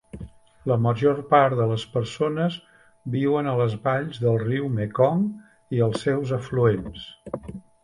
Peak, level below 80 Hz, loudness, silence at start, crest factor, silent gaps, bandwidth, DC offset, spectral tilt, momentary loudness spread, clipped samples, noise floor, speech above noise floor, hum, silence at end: -4 dBFS; -52 dBFS; -23 LUFS; 0.15 s; 18 dB; none; 11 kHz; under 0.1%; -7.5 dB/octave; 18 LU; under 0.1%; -42 dBFS; 20 dB; none; 0.25 s